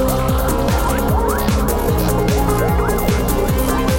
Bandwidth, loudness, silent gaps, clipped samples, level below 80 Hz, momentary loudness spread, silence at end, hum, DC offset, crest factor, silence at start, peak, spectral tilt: 17 kHz; -17 LUFS; none; under 0.1%; -20 dBFS; 1 LU; 0 s; none; under 0.1%; 12 dB; 0 s; -4 dBFS; -5.5 dB/octave